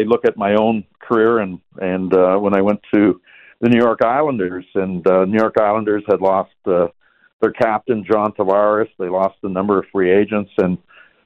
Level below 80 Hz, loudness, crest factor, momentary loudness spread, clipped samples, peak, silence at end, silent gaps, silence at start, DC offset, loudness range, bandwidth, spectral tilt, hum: -58 dBFS; -17 LUFS; 14 dB; 7 LU; under 0.1%; -2 dBFS; 0.5 s; 7.33-7.39 s; 0 s; under 0.1%; 2 LU; 6 kHz; -9 dB/octave; none